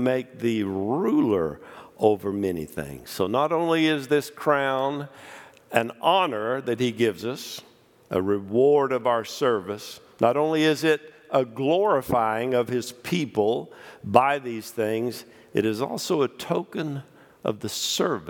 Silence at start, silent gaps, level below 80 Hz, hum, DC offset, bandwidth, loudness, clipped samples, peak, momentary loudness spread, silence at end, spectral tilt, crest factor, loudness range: 0 s; none; -64 dBFS; none; under 0.1%; 18 kHz; -25 LUFS; under 0.1%; 0 dBFS; 13 LU; 0 s; -5 dB/octave; 24 dB; 3 LU